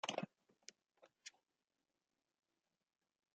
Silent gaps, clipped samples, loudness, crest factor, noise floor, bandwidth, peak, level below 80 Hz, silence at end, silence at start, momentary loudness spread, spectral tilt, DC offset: none; under 0.1%; -54 LUFS; 30 dB; under -90 dBFS; 8.8 kHz; -26 dBFS; under -90 dBFS; 2.05 s; 0.05 s; 15 LU; -3 dB/octave; under 0.1%